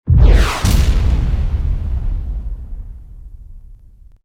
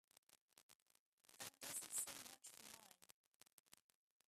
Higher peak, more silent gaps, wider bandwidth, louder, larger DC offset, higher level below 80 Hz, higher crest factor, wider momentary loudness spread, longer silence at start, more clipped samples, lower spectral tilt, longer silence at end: first, 0 dBFS vs -30 dBFS; second, none vs 0.41-0.49 s, 0.62-0.69 s, 0.75-0.86 s, 0.99-1.18 s, 3.13-3.40 s, 3.53-3.66 s; about the same, 15.5 kHz vs 15.5 kHz; first, -17 LUFS vs -51 LUFS; neither; first, -16 dBFS vs under -90 dBFS; second, 14 dB vs 28 dB; about the same, 21 LU vs 21 LU; second, 0.05 s vs 0.3 s; neither; first, -6 dB/octave vs 0.5 dB/octave; about the same, 0.5 s vs 0.45 s